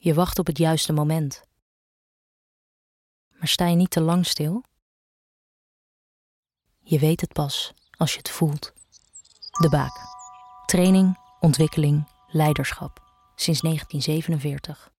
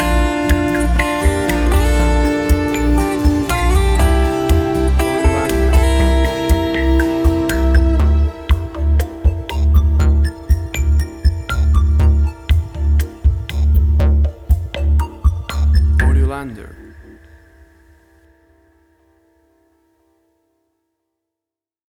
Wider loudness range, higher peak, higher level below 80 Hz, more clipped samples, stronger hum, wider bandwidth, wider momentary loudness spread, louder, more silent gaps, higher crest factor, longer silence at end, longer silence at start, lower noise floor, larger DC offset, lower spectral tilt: about the same, 6 LU vs 4 LU; second, -8 dBFS vs -2 dBFS; second, -48 dBFS vs -16 dBFS; neither; neither; about the same, 16.5 kHz vs 16 kHz; first, 14 LU vs 5 LU; second, -23 LUFS vs -16 LUFS; first, 1.62-3.31 s, 4.82-6.43 s vs none; about the same, 16 dB vs 12 dB; second, 0.25 s vs 4.85 s; about the same, 0.05 s vs 0 s; second, -51 dBFS vs -87 dBFS; neither; about the same, -5.5 dB/octave vs -6.5 dB/octave